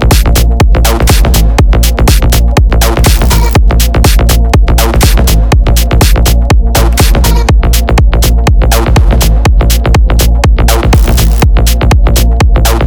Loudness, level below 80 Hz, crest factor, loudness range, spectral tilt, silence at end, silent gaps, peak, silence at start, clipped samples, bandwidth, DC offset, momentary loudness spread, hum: -8 LUFS; -6 dBFS; 4 dB; 0 LU; -5 dB/octave; 0 s; none; 0 dBFS; 0 s; 0.2%; over 20 kHz; under 0.1%; 1 LU; none